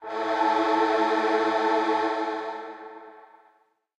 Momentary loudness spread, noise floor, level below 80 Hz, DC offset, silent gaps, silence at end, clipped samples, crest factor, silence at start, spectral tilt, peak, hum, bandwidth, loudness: 18 LU; -65 dBFS; -80 dBFS; under 0.1%; none; 0.8 s; under 0.1%; 14 dB; 0 s; -3.5 dB/octave; -12 dBFS; none; 9.8 kHz; -24 LUFS